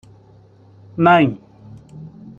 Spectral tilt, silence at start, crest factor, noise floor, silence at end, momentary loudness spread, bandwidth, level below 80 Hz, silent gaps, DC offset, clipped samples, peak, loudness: -8.5 dB/octave; 0.95 s; 18 dB; -48 dBFS; 0.3 s; 25 LU; 7.2 kHz; -56 dBFS; none; under 0.1%; under 0.1%; -2 dBFS; -15 LUFS